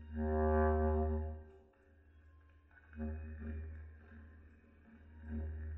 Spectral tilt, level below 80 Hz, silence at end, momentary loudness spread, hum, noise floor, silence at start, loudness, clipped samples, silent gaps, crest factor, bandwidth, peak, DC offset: -10 dB/octave; -44 dBFS; 0 s; 25 LU; none; -66 dBFS; 0 s; -38 LUFS; under 0.1%; none; 18 dB; 3 kHz; -22 dBFS; under 0.1%